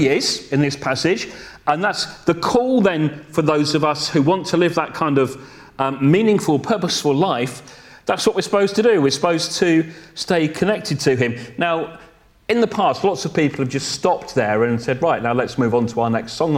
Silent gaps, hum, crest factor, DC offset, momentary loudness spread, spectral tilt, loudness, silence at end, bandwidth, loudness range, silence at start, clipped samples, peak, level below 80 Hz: none; none; 18 dB; under 0.1%; 7 LU; -5 dB/octave; -19 LUFS; 0 s; 16 kHz; 2 LU; 0 s; under 0.1%; -2 dBFS; -54 dBFS